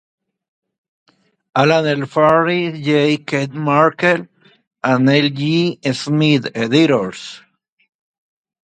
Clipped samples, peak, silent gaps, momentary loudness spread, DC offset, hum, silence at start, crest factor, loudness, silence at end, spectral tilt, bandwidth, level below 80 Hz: under 0.1%; 0 dBFS; 4.67-4.71 s; 8 LU; under 0.1%; none; 1.55 s; 18 dB; -16 LUFS; 1.3 s; -6 dB/octave; 9.2 kHz; -60 dBFS